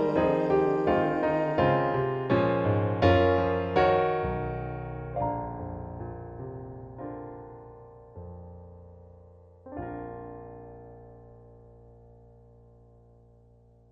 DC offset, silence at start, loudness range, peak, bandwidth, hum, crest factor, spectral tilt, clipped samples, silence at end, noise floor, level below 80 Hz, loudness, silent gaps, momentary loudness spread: under 0.1%; 0 s; 19 LU; -10 dBFS; 7.2 kHz; none; 20 dB; -9 dB/octave; under 0.1%; 2.35 s; -58 dBFS; -50 dBFS; -27 LUFS; none; 23 LU